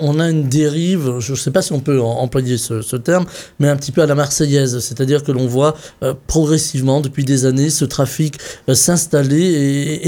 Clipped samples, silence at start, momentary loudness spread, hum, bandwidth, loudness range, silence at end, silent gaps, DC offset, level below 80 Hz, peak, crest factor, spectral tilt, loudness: under 0.1%; 0 s; 6 LU; none; 18 kHz; 2 LU; 0 s; none; under 0.1%; -40 dBFS; -2 dBFS; 14 dB; -5 dB/octave; -16 LUFS